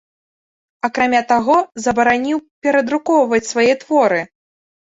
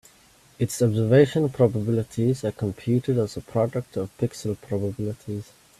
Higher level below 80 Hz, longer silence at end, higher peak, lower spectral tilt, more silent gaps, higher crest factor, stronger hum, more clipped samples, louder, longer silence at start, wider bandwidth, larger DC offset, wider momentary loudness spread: about the same, -56 dBFS vs -56 dBFS; first, 0.6 s vs 0.35 s; about the same, -2 dBFS vs -4 dBFS; second, -4 dB/octave vs -7 dB/octave; first, 2.51-2.62 s vs none; second, 14 dB vs 20 dB; neither; neither; first, -16 LUFS vs -24 LUFS; first, 0.85 s vs 0.6 s; second, 8 kHz vs 14 kHz; neither; second, 7 LU vs 13 LU